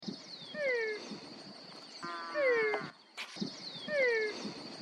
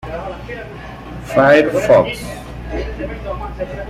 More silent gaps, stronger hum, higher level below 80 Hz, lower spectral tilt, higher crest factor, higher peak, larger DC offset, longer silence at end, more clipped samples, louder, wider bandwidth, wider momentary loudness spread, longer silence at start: neither; neither; second, -86 dBFS vs -32 dBFS; second, -3.5 dB/octave vs -6 dB/octave; about the same, 18 dB vs 16 dB; second, -20 dBFS vs -2 dBFS; neither; about the same, 0 s vs 0 s; neither; second, -35 LUFS vs -16 LUFS; second, 11 kHz vs 14.5 kHz; second, 17 LU vs 20 LU; about the same, 0 s vs 0 s